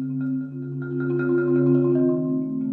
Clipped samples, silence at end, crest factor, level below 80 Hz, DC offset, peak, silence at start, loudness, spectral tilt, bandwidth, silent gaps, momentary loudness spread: under 0.1%; 0 s; 12 dB; -68 dBFS; under 0.1%; -10 dBFS; 0 s; -23 LUFS; -13 dB/octave; 2.7 kHz; none; 10 LU